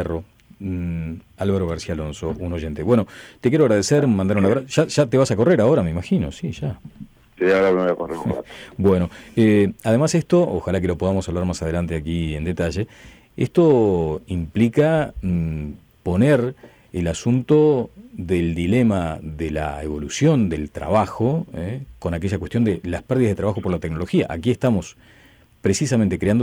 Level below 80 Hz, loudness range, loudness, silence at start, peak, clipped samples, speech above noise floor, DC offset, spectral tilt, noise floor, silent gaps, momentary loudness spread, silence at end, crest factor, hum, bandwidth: -40 dBFS; 4 LU; -20 LUFS; 0 s; -6 dBFS; under 0.1%; 32 dB; under 0.1%; -7 dB/octave; -51 dBFS; none; 12 LU; 0 s; 14 dB; none; 19.5 kHz